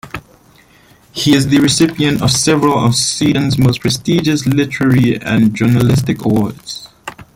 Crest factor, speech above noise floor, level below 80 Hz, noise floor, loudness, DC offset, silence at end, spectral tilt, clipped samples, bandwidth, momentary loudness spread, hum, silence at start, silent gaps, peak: 14 dB; 34 dB; -42 dBFS; -46 dBFS; -13 LUFS; under 0.1%; 0.1 s; -5 dB/octave; under 0.1%; 16.5 kHz; 16 LU; none; 0.05 s; none; 0 dBFS